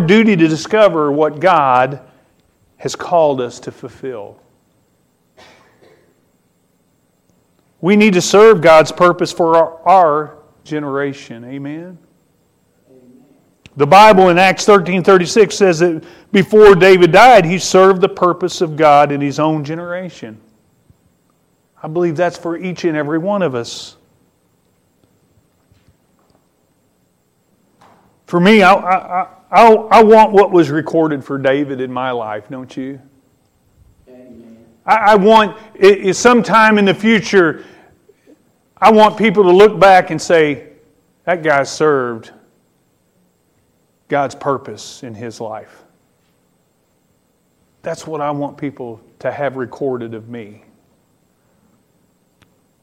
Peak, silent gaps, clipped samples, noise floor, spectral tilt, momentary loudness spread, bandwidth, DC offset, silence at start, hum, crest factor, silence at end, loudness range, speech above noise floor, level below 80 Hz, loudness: 0 dBFS; none; under 0.1%; -60 dBFS; -5 dB/octave; 21 LU; 15.5 kHz; under 0.1%; 0 s; none; 14 dB; 2.4 s; 17 LU; 48 dB; -50 dBFS; -11 LUFS